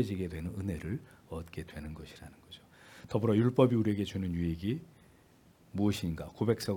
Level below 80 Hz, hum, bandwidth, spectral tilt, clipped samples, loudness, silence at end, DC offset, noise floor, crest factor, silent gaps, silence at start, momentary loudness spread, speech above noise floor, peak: -58 dBFS; none; 18 kHz; -7.5 dB/octave; under 0.1%; -33 LUFS; 0 s; under 0.1%; -62 dBFS; 24 dB; none; 0 s; 23 LU; 29 dB; -10 dBFS